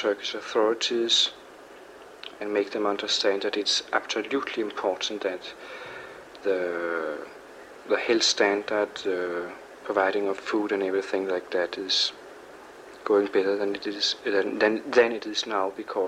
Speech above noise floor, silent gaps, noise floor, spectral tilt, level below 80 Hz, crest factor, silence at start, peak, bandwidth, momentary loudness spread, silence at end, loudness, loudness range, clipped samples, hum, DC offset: 21 dB; none; -47 dBFS; -2 dB/octave; -70 dBFS; 20 dB; 0 s; -8 dBFS; 12.5 kHz; 21 LU; 0 s; -26 LUFS; 4 LU; under 0.1%; none; under 0.1%